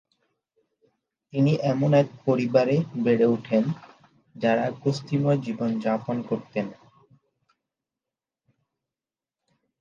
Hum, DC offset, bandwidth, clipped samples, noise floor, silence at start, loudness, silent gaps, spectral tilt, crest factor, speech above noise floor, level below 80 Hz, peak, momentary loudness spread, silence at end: none; under 0.1%; 7.4 kHz; under 0.1%; under -90 dBFS; 1.35 s; -24 LUFS; none; -8 dB/octave; 20 dB; over 67 dB; -70 dBFS; -6 dBFS; 9 LU; 3.1 s